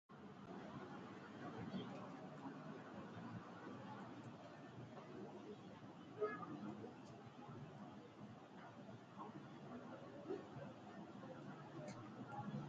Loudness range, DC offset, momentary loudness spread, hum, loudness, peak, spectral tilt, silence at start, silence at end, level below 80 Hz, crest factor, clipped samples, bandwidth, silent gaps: 3 LU; under 0.1%; 8 LU; none; -54 LUFS; -32 dBFS; -6 dB/octave; 0.1 s; 0 s; -82 dBFS; 22 dB; under 0.1%; 7.6 kHz; none